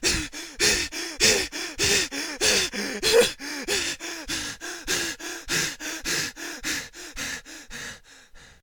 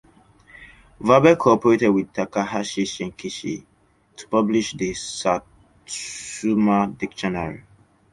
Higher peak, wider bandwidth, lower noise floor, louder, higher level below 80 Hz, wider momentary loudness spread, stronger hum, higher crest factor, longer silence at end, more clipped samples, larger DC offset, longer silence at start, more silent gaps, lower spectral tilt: second, -6 dBFS vs -2 dBFS; first, over 20 kHz vs 11.5 kHz; second, -49 dBFS vs -59 dBFS; second, -24 LUFS vs -21 LUFS; first, -46 dBFS vs -54 dBFS; about the same, 15 LU vs 15 LU; neither; about the same, 20 dB vs 20 dB; second, 0.1 s vs 0.55 s; neither; neither; second, 0 s vs 0.6 s; neither; second, -1 dB/octave vs -5 dB/octave